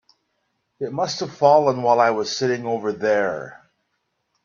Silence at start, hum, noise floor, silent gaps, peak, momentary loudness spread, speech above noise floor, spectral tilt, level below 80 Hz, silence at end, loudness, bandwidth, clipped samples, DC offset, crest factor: 0.8 s; none; -73 dBFS; none; -2 dBFS; 14 LU; 54 dB; -4.5 dB/octave; -68 dBFS; 0.9 s; -20 LUFS; 7.4 kHz; under 0.1%; under 0.1%; 20 dB